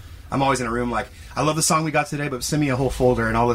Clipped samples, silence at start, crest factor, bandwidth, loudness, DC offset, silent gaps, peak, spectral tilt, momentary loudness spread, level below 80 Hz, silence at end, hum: under 0.1%; 0 s; 16 dB; 16 kHz; -22 LUFS; under 0.1%; none; -6 dBFS; -4.5 dB/octave; 7 LU; -38 dBFS; 0 s; none